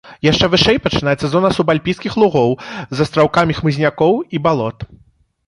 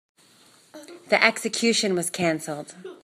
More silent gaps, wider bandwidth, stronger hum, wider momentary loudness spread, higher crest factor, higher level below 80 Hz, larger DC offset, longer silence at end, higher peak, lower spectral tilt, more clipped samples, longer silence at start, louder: neither; second, 11.5 kHz vs 15.5 kHz; neither; second, 8 LU vs 21 LU; second, 14 dB vs 26 dB; first, -40 dBFS vs -74 dBFS; neither; first, 0.5 s vs 0.1 s; about the same, 0 dBFS vs 0 dBFS; first, -6 dB/octave vs -3 dB/octave; neither; second, 0.05 s vs 0.75 s; first, -15 LUFS vs -22 LUFS